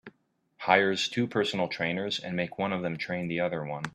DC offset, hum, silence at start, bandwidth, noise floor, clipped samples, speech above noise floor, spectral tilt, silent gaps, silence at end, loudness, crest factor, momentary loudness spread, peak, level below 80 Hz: under 0.1%; none; 0.05 s; 13 kHz; -69 dBFS; under 0.1%; 40 dB; -5 dB/octave; none; 0.05 s; -29 LUFS; 24 dB; 9 LU; -4 dBFS; -68 dBFS